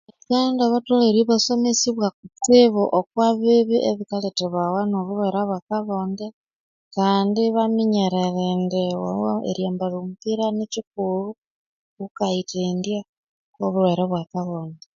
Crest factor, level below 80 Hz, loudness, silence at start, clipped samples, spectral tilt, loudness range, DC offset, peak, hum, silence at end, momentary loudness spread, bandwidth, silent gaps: 18 dB; -64 dBFS; -21 LUFS; 0.3 s; under 0.1%; -5.5 dB/octave; 8 LU; under 0.1%; -2 dBFS; none; 0.2 s; 11 LU; 7.6 kHz; 2.14-2.23 s, 5.62-5.67 s, 6.33-6.44 s, 6.55-6.91 s, 10.87-10.91 s, 11.38-11.97 s, 12.11-12.15 s, 13.09-13.53 s